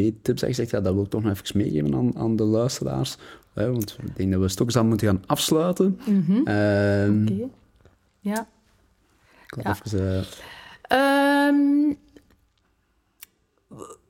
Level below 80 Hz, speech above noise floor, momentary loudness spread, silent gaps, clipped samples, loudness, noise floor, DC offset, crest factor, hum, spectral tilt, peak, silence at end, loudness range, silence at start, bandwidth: -54 dBFS; 45 dB; 17 LU; none; under 0.1%; -23 LUFS; -68 dBFS; under 0.1%; 18 dB; none; -6 dB/octave; -4 dBFS; 0.15 s; 6 LU; 0 s; 17 kHz